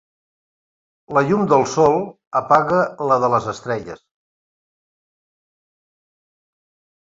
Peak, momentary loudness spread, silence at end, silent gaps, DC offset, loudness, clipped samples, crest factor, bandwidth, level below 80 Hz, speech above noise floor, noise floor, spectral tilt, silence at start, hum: -2 dBFS; 10 LU; 3.05 s; 2.27-2.31 s; under 0.1%; -18 LUFS; under 0.1%; 20 dB; 7.8 kHz; -58 dBFS; over 73 dB; under -90 dBFS; -6 dB/octave; 1.1 s; none